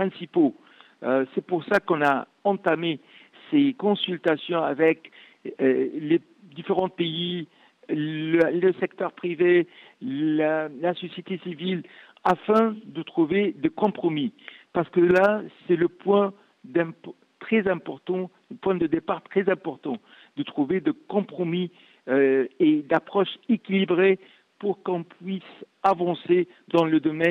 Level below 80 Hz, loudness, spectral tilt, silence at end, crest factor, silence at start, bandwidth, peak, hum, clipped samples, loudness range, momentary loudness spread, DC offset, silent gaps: -68 dBFS; -25 LUFS; -8 dB/octave; 0 s; 16 dB; 0 s; 6.6 kHz; -8 dBFS; none; under 0.1%; 4 LU; 13 LU; under 0.1%; none